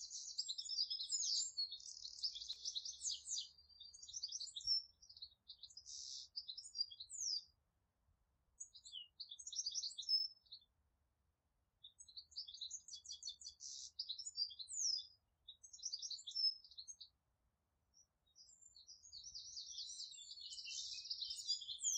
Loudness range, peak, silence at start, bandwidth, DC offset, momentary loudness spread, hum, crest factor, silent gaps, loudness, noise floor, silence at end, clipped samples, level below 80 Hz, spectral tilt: 9 LU; -30 dBFS; 0 s; 9 kHz; under 0.1%; 20 LU; none; 20 dB; none; -44 LUFS; -86 dBFS; 0 s; under 0.1%; -84 dBFS; 4.5 dB/octave